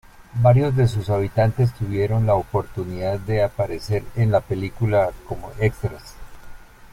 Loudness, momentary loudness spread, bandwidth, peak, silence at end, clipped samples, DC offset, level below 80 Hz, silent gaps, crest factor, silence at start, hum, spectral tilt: -21 LUFS; 13 LU; 14.5 kHz; -2 dBFS; 0.05 s; under 0.1%; under 0.1%; -40 dBFS; none; 18 dB; 0.2 s; none; -8 dB/octave